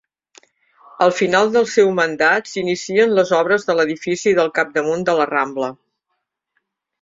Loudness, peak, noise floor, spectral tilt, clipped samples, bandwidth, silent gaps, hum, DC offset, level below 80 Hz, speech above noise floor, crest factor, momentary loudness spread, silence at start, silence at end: -17 LUFS; -2 dBFS; -75 dBFS; -4.5 dB/octave; under 0.1%; 7.8 kHz; none; none; under 0.1%; -62 dBFS; 58 dB; 16 dB; 5 LU; 1 s; 1.3 s